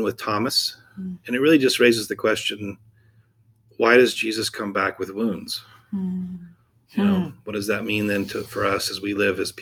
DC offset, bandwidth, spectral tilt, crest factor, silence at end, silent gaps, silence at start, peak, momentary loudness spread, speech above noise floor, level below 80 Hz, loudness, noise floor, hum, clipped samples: under 0.1%; over 20 kHz; -4 dB/octave; 20 dB; 0 s; none; 0 s; -2 dBFS; 15 LU; 37 dB; -60 dBFS; -22 LUFS; -59 dBFS; none; under 0.1%